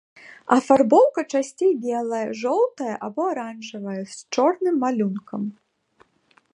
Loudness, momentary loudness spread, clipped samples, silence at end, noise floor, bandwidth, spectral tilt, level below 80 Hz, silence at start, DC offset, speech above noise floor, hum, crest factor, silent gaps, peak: -22 LUFS; 15 LU; under 0.1%; 1 s; -61 dBFS; 11 kHz; -5.5 dB/octave; -72 dBFS; 0.25 s; under 0.1%; 40 dB; none; 20 dB; none; -2 dBFS